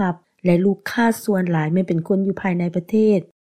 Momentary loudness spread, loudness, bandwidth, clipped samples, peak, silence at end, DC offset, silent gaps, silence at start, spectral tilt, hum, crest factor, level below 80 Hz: 4 LU; -20 LUFS; 15.5 kHz; under 0.1%; -6 dBFS; 0.15 s; 0.1%; none; 0 s; -7.5 dB/octave; none; 14 dB; -58 dBFS